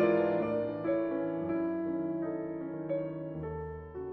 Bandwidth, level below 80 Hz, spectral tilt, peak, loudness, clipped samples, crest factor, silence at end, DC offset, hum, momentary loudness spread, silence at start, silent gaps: 4.5 kHz; -58 dBFS; -7.5 dB/octave; -16 dBFS; -34 LUFS; under 0.1%; 18 dB; 0 s; under 0.1%; none; 9 LU; 0 s; none